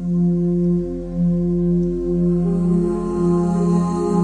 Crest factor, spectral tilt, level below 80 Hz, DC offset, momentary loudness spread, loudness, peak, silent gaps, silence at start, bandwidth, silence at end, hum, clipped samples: 12 dB; -10 dB/octave; -34 dBFS; under 0.1%; 3 LU; -19 LUFS; -6 dBFS; none; 0 s; 9 kHz; 0 s; none; under 0.1%